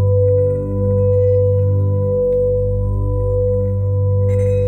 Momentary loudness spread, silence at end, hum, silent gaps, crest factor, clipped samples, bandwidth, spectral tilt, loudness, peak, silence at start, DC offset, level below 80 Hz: 5 LU; 0 s; 50 Hz at -30 dBFS; none; 8 dB; under 0.1%; 2.7 kHz; -11.5 dB/octave; -16 LUFS; -6 dBFS; 0 s; under 0.1%; -28 dBFS